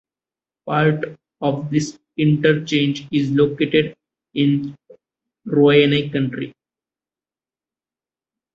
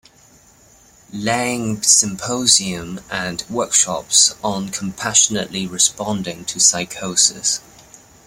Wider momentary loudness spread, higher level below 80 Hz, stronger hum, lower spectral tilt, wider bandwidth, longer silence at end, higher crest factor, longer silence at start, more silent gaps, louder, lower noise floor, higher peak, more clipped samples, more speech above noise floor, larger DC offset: first, 15 LU vs 12 LU; about the same, -58 dBFS vs -54 dBFS; neither; first, -6.5 dB/octave vs -1.5 dB/octave; second, 8.2 kHz vs 16.5 kHz; first, 2.05 s vs 0.65 s; about the same, 18 dB vs 20 dB; second, 0.65 s vs 1.15 s; neither; second, -19 LUFS vs -16 LUFS; first, under -90 dBFS vs -50 dBFS; about the same, -2 dBFS vs 0 dBFS; neither; first, over 72 dB vs 31 dB; neither